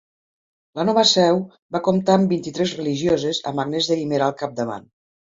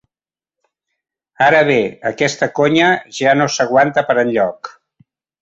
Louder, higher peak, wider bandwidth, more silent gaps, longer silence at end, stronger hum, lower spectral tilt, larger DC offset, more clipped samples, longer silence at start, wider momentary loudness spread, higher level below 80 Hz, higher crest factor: second, -20 LUFS vs -14 LUFS; about the same, 0 dBFS vs -2 dBFS; about the same, 7.8 kHz vs 8.2 kHz; first, 1.62-1.69 s vs none; second, 0.4 s vs 0.75 s; neither; about the same, -5 dB/octave vs -4.5 dB/octave; neither; neither; second, 0.75 s vs 1.4 s; first, 12 LU vs 7 LU; about the same, -58 dBFS vs -58 dBFS; about the same, 20 dB vs 16 dB